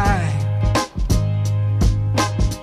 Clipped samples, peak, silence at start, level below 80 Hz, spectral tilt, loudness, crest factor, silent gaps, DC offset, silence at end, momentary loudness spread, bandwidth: under 0.1%; -6 dBFS; 0 s; -24 dBFS; -5.5 dB/octave; -20 LUFS; 12 dB; none; under 0.1%; 0 s; 2 LU; 14 kHz